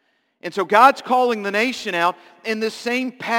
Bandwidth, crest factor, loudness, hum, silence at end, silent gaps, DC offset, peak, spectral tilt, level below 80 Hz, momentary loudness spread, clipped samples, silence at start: 17 kHz; 20 dB; -19 LUFS; none; 0 s; none; under 0.1%; 0 dBFS; -3.5 dB/octave; -72 dBFS; 14 LU; under 0.1%; 0.45 s